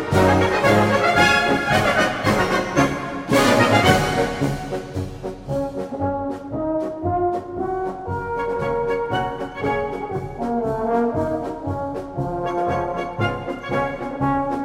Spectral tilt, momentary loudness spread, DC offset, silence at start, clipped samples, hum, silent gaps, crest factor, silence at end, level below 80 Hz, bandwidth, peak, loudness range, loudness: -5.5 dB/octave; 12 LU; under 0.1%; 0 s; under 0.1%; none; none; 18 dB; 0 s; -42 dBFS; 16.5 kHz; -2 dBFS; 8 LU; -21 LUFS